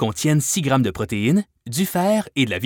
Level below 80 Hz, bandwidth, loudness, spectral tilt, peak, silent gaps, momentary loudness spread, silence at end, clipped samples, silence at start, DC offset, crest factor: -50 dBFS; over 20 kHz; -20 LUFS; -5 dB/octave; -6 dBFS; none; 4 LU; 0 s; under 0.1%; 0 s; under 0.1%; 14 dB